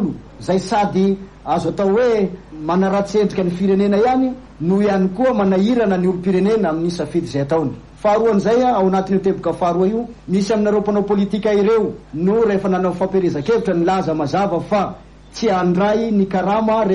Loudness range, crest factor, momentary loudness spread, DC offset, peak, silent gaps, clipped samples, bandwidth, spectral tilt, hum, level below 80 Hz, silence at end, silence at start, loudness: 1 LU; 12 dB; 6 LU; under 0.1%; -6 dBFS; none; under 0.1%; 10.5 kHz; -7.5 dB/octave; none; -44 dBFS; 0 s; 0 s; -17 LUFS